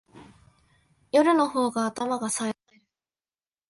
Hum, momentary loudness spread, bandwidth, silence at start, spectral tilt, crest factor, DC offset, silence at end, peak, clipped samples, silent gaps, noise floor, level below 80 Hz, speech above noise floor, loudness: none; 10 LU; 11.5 kHz; 0.15 s; -3.5 dB/octave; 18 dB; under 0.1%; 1.15 s; -10 dBFS; under 0.1%; none; under -90 dBFS; -70 dBFS; over 66 dB; -25 LUFS